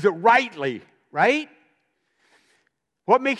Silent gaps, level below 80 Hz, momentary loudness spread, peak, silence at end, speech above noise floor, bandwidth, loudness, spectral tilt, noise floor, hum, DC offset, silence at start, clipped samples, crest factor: none; -78 dBFS; 20 LU; -4 dBFS; 0 s; 51 dB; 11.5 kHz; -21 LUFS; -5 dB/octave; -71 dBFS; none; under 0.1%; 0 s; under 0.1%; 20 dB